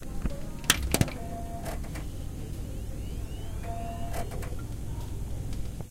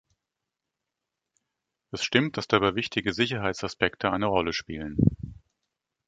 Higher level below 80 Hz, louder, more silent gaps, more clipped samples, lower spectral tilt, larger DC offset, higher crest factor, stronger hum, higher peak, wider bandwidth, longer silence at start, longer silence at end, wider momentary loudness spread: first, -36 dBFS vs -48 dBFS; second, -34 LUFS vs -26 LUFS; neither; neither; second, -4 dB/octave vs -5.5 dB/octave; first, 0.2% vs under 0.1%; first, 32 dB vs 24 dB; neither; first, 0 dBFS vs -4 dBFS; first, 16.5 kHz vs 9.2 kHz; second, 0 s vs 1.95 s; second, 0 s vs 0.7 s; first, 12 LU vs 8 LU